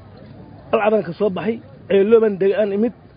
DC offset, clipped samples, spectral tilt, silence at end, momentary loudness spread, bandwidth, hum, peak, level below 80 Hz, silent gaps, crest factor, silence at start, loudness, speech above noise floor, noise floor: under 0.1%; under 0.1%; -11.5 dB/octave; 0.25 s; 10 LU; 5.2 kHz; none; -2 dBFS; -54 dBFS; none; 16 dB; 0.1 s; -18 LUFS; 23 dB; -40 dBFS